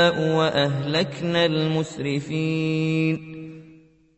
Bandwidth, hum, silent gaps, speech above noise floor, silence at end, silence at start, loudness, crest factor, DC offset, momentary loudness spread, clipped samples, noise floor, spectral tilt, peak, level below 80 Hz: 8.4 kHz; none; none; 29 dB; 0.45 s; 0 s; -23 LUFS; 18 dB; under 0.1%; 9 LU; under 0.1%; -52 dBFS; -6 dB/octave; -4 dBFS; -58 dBFS